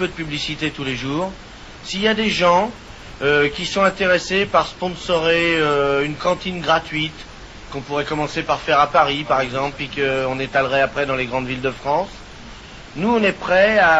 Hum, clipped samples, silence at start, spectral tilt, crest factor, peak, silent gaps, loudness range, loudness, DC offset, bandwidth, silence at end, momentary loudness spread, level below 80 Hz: none; under 0.1%; 0 s; -4.5 dB/octave; 18 dB; -2 dBFS; none; 3 LU; -19 LUFS; under 0.1%; 8 kHz; 0 s; 18 LU; -42 dBFS